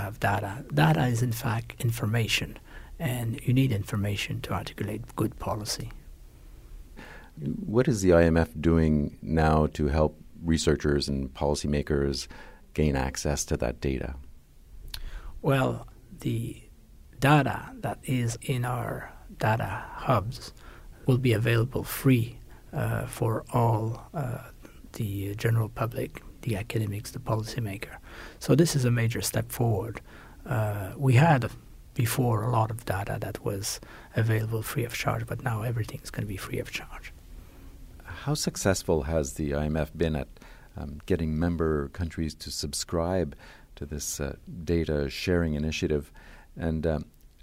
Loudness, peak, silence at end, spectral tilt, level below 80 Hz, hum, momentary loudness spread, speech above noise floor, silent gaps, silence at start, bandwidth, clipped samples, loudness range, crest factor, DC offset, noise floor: -28 LUFS; -8 dBFS; 0.15 s; -6 dB/octave; -42 dBFS; none; 16 LU; 24 dB; none; 0 s; 16 kHz; under 0.1%; 6 LU; 20 dB; under 0.1%; -51 dBFS